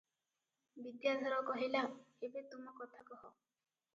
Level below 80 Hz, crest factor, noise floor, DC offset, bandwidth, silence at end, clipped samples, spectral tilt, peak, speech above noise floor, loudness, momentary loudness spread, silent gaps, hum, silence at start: under -90 dBFS; 20 dB; under -90 dBFS; under 0.1%; 7.4 kHz; 0.65 s; under 0.1%; -1 dB/octave; -24 dBFS; over 48 dB; -41 LUFS; 18 LU; none; none; 0.75 s